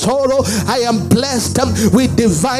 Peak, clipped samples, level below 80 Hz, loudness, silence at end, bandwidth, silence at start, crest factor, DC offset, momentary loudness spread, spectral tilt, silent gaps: 0 dBFS; under 0.1%; -38 dBFS; -14 LUFS; 0 s; 15.5 kHz; 0 s; 14 dB; under 0.1%; 3 LU; -5 dB/octave; none